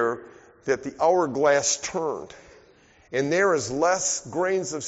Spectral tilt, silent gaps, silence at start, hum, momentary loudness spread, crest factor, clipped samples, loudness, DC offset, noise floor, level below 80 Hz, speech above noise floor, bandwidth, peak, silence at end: -3 dB/octave; none; 0 s; none; 11 LU; 16 dB; under 0.1%; -24 LUFS; under 0.1%; -56 dBFS; -62 dBFS; 32 dB; 8 kHz; -8 dBFS; 0 s